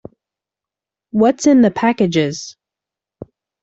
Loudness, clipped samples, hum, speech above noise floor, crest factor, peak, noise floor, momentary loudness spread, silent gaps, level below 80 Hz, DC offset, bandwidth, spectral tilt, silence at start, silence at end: -15 LUFS; under 0.1%; none; 73 dB; 16 dB; -2 dBFS; -87 dBFS; 14 LU; none; -56 dBFS; under 0.1%; 8 kHz; -5.5 dB/octave; 1.15 s; 0.4 s